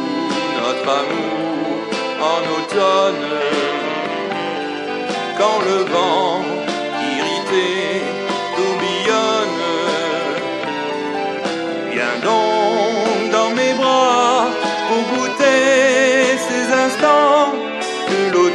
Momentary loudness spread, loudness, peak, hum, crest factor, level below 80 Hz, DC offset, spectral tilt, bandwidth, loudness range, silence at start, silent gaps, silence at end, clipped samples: 9 LU; -17 LUFS; 0 dBFS; none; 16 dB; -66 dBFS; under 0.1%; -3 dB/octave; 11.5 kHz; 4 LU; 0 s; none; 0 s; under 0.1%